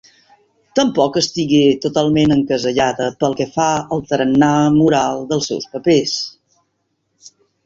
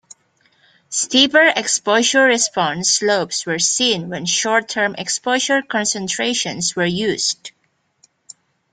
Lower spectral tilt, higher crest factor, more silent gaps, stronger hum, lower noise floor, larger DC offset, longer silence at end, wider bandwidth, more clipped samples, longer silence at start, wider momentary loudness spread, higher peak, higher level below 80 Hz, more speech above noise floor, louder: first, -5 dB/octave vs -1.5 dB/octave; about the same, 16 dB vs 18 dB; neither; neither; about the same, -69 dBFS vs -66 dBFS; neither; about the same, 1.35 s vs 1.25 s; second, 7.8 kHz vs 10.5 kHz; neither; second, 0.75 s vs 0.9 s; about the same, 7 LU vs 8 LU; about the same, -2 dBFS vs 0 dBFS; first, -50 dBFS vs -62 dBFS; first, 54 dB vs 48 dB; about the same, -16 LUFS vs -16 LUFS